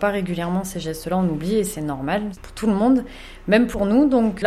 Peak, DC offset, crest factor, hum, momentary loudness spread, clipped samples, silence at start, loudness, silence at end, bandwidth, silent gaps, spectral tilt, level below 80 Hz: -2 dBFS; under 0.1%; 18 dB; none; 11 LU; under 0.1%; 0 s; -21 LUFS; 0 s; 15.5 kHz; none; -6 dB/octave; -42 dBFS